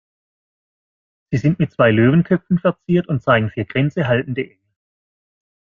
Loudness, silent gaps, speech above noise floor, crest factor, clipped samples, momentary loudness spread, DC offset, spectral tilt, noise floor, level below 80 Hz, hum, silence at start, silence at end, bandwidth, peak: -18 LUFS; none; over 73 dB; 18 dB; under 0.1%; 9 LU; under 0.1%; -9 dB/octave; under -90 dBFS; -52 dBFS; none; 1.3 s; 1.35 s; 7 kHz; -2 dBFS